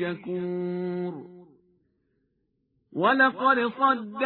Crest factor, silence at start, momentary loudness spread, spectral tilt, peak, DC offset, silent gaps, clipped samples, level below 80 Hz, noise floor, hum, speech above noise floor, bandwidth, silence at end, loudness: 20 dB; 0 s; 14 LU; -9 dB/octave; -8 dBFS; under 0.1%; none; under 0.1%; -74 dBFS; -74 dBFS; none; 49 dB; 4.4 kHz; 0 s; -25 LUFS